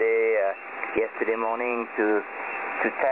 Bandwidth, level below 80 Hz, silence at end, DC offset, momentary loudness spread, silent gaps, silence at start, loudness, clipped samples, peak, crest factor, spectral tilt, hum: 4 kHz; -70 dBFS; 0 s; under 0.1%; 7 LU; none; 0 s; -26 LUFS; under 0.1%; -10 dBFS; 16 dB; -8 dB/octave; none